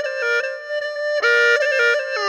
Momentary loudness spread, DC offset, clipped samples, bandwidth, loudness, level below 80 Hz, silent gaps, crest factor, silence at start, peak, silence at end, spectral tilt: 10 LU; under 0.1%; under 0.1%; 13 kHz; -18 LUFS; -78 dBFS; none; 16 dB; 0 s; -2 dBFS; 0 s; 2 dB/octave